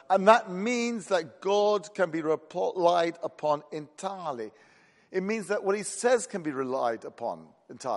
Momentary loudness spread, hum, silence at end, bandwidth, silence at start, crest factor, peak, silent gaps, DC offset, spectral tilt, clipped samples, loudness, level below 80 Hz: 12 LU; none; 0 s; 11.5 kHz; 0.1 s; 24 dB; -4 dBFS; none; under 0.1%; -4 dB/octave; under 0.1%; -28 LUFS; -80 dBFS